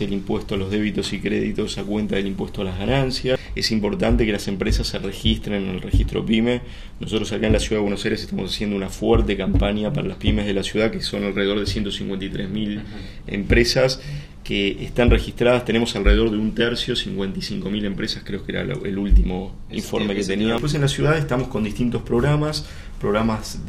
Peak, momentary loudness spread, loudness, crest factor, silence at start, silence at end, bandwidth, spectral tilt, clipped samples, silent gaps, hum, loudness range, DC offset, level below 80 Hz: -2 dBFS; 8 LU; -22 LUFS; 20 dB; 0 s; 0 s; 14.5 kHz; -5.5 dB/octave; under 0.1%; none; none; 3 LU; under 0.1%; -28 dBFS